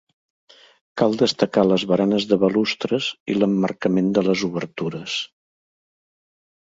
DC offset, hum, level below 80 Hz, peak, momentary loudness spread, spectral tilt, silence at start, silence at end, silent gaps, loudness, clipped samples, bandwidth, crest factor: under 0.1%; none; -60 dBFS; -2 dBFS; 9 LU; -5.5 dB/octave; 0.95 s; 1.4 s; 3.20-3.26 s; -21 LUFS; under 0.1%; 7.8 kHz; 20 dB